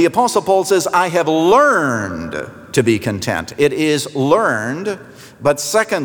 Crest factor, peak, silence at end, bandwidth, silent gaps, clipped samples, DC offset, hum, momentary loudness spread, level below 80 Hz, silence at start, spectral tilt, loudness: 14 dB; -2 dBFS; 0 s; over 20 kHz; none; under 0.1%; under 0.1%; none; 11 LU; -54 dBFS; 0 s; -4.5 dB/octave; -16 LUFS